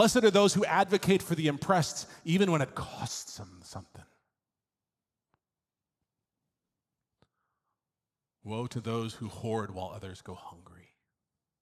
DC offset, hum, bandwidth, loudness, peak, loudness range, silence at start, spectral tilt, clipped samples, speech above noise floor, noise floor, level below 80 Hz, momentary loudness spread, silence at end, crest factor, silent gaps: under 0.1%; none; 14.5 kHz; -29 LUFS; -10 dBFS; 17 LU; 0 s; -5 dB/octave; under 0.1%; over 60 dB; under -90 dBFS; -64 dBFS; 21 LU; 1.1 s; 22 dB; none